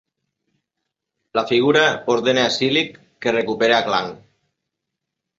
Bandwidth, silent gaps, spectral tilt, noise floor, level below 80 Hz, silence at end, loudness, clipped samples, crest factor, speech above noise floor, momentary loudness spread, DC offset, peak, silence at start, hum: 7.8 kHz; none; -4 dB/octave; -81 dBFS; -62 dBFS; 1.2 s; -18 LUFS; under 0.1%; 20 dB; 63 dB; 9 LU; under 0.1%; -2 dBFS; 1.35 s; none